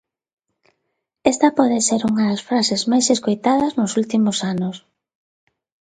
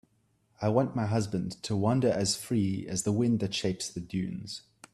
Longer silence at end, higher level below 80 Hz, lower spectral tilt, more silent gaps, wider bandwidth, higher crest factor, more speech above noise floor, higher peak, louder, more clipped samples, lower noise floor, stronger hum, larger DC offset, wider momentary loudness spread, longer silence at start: first, 1.15 s vs 0.35 s; about the same, -60 dBFS vs -62 dBFS; second, -4 dB/octave vs -5.5 dB/octave; neither; second, 9.6 kHz vs 13 kHz; about the same, 20 dB vs 18 dB; first, 57 dB vs 41 dB; first, 0 dBFS vs -12 dBFS; first, -18 LUFS vs -30 LUFS; neither; first, -75 dBFS vs -71 dBFS; neither; neither; second, 6 LU vs 9 LU; first, 1.25 s vs 0.6 s